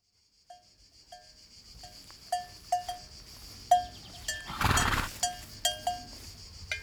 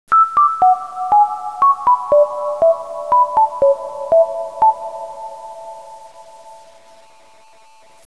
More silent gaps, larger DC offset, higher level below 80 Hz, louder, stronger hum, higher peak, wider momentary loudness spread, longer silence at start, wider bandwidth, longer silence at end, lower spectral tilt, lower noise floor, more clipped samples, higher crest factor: neither; second, under 0.1% vs 0.4%; first, -46 dBFS vs -58 dBFS; second, -31 LUFS vs -15 LUFS; neither; second, -10 dBFS vs -4 dBFS; first, 23 LU vs 19 LU; first, 0.5 s vs 0.1 s; first, over 20 kHz vs 11 kHz; second, 0 s vs 1.5 s; second, -2.5 dB/octave vs -4.5 dB/octave; first, -69 dBFS vs -48 dBFS; neither; first, 24 dB vs 12 dB